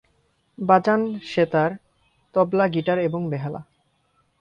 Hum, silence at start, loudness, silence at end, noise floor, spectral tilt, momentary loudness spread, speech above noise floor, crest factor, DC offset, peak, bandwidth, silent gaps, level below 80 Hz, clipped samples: none; 0.6 s; -22 LUFS; 0.8 s; -67 dBFS; -8 dB/octave; 12 LU; 46 dB; 20 dB; under 0.1%; -2 dBFS; 9 kHz; none; -62 dBFS; under 0.1%